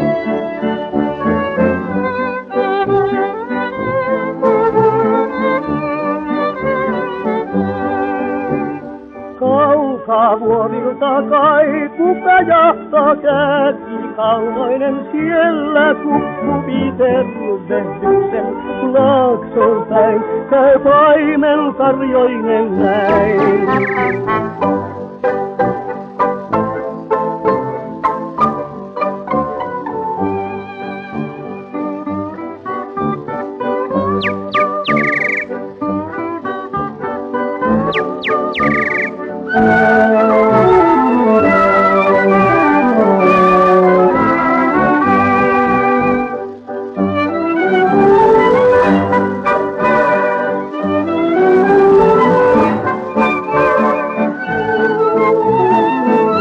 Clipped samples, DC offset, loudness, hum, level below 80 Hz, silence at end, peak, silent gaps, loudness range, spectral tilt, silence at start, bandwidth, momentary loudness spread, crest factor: under 0.1%; under 0.1%; -14 LUFS; none; -46 dBFS; 0 s; 0 dBFS; none; 8 LU; -8 dB/octave; 0 s; 7.4 kHz; 11 LU; 12 dB